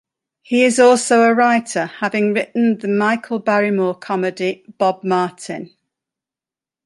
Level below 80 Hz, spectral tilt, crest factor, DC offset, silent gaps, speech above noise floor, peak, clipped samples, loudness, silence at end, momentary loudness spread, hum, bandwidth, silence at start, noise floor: -68 dBFS; -4.5 dB/octave; 16 dB; under 0.1%; none; 73 dB; -2 dBFS; under 0.1%; -17 LUFS; 1.2 s; 11 LU; none; 11.5 kHz; 0.5 s; -90 dBFS